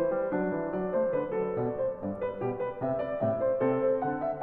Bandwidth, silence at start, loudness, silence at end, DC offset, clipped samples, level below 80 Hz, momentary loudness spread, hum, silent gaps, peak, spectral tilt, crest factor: 3.8 kHz; 0 s; -30 LUFS; 0 s; under 0.1%; under 0.1%; -60 dBFS; 6 LU; none; none; -16 dBFS; -11 dB/octave; 14 dB